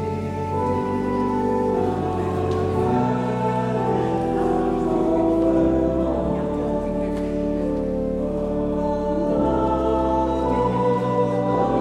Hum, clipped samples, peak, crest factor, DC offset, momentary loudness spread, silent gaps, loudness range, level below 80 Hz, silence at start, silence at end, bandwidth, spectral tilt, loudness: none; under 0.1%; -8 dBFS; 14 dB; under 0.1%; 5 LU; none; 2 LU; -36 dBFS; 0 s; 0 s; 11 kHz; -8.5 dB/octave; -22 LUFS